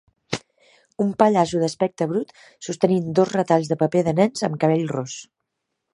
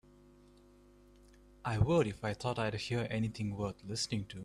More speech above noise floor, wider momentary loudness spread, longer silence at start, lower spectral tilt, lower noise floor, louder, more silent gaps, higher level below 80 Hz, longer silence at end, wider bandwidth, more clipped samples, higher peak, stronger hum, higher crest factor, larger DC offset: first, 58 dB vs 27 dB; first, 13 LU vs 9 LU; second, 0.3 s vs 1.65 s; about the same, -6 dB/octave vs -5.5 dB/octave; first, -79 dBFS vs -61 dBFS; first, -21 LUFS vs -36 LUFS; neither; second, -62 dBFS vs -56 dBFS; first, 0.7 s vs 0 s; about the same, 11.5 kHz vs 12 kHz; neither; first, -2 dBFS vs -16 dBFS; second, none vs 50 Hz at -55 dBFS; about the same, 20 dB vs 20 dB; neither